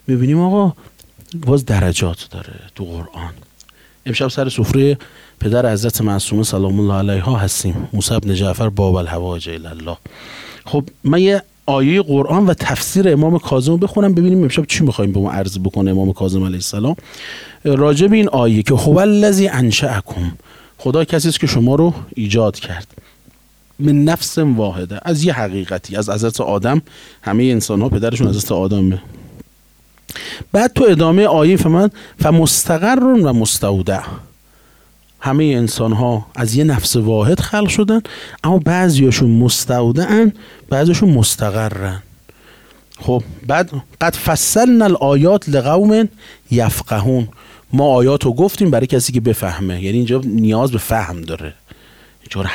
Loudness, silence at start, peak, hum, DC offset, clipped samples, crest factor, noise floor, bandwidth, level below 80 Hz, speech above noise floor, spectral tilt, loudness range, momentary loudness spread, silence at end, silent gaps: -15 LUFS; 0.1 s; -2 dBFS; none; under 0.1%; under 0.1%; 14 dB; -50 dBFS; 18 kHz; -40 dBFS; 36 dB; -5.5 dB/octave; 5 LU; 14 LU; 0 s; none